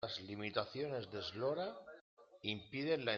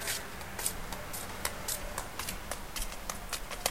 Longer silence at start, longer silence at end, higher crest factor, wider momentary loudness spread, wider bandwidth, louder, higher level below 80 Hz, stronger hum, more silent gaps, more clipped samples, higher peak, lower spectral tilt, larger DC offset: about the same, 0 s vs 0 s; about the same, 0 s vs 0 s; second, 22 dB vs 28 dB; first, 10 LU vs 5 LU; second, 7.2 kHz vs 17 kHz; second, -42 LUFS vs -37 LUFS; second, -78 dBFS vs -46 dBFS; neither; first, 2.01-2.17 s vs none; neither; second, -20 dBFS vs -10 dBFS; first, -3 dB/octave vs -1.5 dB/octave; second, under 0.1% vs 0.4%